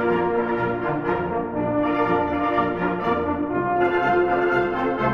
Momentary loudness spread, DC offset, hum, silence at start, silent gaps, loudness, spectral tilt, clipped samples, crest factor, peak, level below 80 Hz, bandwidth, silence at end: 4 LU; 0.1%; none; 0 s; none; -22 LUFS; -8.5 dB/octave; under 0.1%; 14 dB; -8 dBFS; -48 dBFS; 6.2 kHz; 0 s